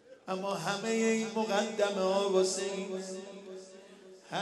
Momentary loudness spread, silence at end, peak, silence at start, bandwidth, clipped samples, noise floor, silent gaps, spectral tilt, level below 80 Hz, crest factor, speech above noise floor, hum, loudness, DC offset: 18 LU; 0 s; -16 dBFS; 0.1 s; 12 kHz; under 0.1%; -54 dBFS; none; -4 dB/octave; -86 dBFS; 18 dB; 22 dB; none; -32 LUFS; under 0.1%